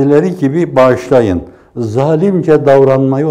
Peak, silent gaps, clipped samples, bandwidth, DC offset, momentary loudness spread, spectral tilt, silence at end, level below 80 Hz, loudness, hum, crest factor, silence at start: 0 dBFS; none; 0.3%; 11.5 kHz; under 0.1%; 10 LU; -8.5 dB/octave; 0 s; -44 dBFS; -10 LUFS; none; 10 dB; 0 s